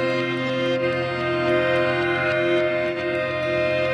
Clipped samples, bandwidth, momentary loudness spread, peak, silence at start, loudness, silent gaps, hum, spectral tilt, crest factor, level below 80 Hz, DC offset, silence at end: under 0.1%; 10.5 kHz; 4 LU; -10 dBFS; 0 s; -22 LUFS; none; none; -6.5 dB/octave; 12 dB; -54 dBFS; under 0.1%; 0 s